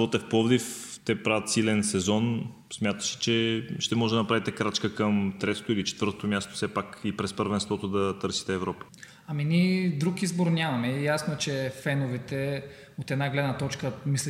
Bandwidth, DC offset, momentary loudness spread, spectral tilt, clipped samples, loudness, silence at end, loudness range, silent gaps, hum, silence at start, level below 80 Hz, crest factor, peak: 16 kHz; under 0.1%; 8 LU; -5 dB/octave; under 0.1%; -28 LUFS; 0 s; 3 LU; none; none; 0 s; -64 dBFS; 18 dB; -10 dBFS